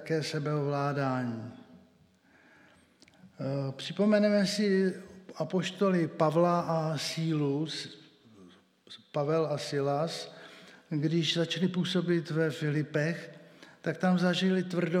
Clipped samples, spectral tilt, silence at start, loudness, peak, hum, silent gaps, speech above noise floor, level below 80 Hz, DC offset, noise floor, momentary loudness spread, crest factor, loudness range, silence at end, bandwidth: under 0.1%; -6 dB/octave; 0 s; -30 LUFS; -12 dBFS; none; none; 34 dB; -80 dBFS; under 0.1%; -64 dBFS; 13 LU; 18 dB; 6 LU; 0 s; 14 kHz